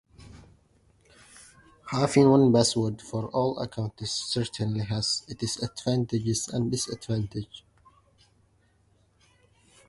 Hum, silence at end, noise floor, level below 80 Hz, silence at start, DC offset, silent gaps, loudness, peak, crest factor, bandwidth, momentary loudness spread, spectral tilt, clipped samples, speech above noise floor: none; 2.3 s; -65 dBFS; -56 dBFS; 0.25 s; under 0.1%; none; -27 LUFS; -6 dBFS; 22 dB; 11.5 kHz; 14 LU; -5.5 dB/octave; under 0.1%; 39 dB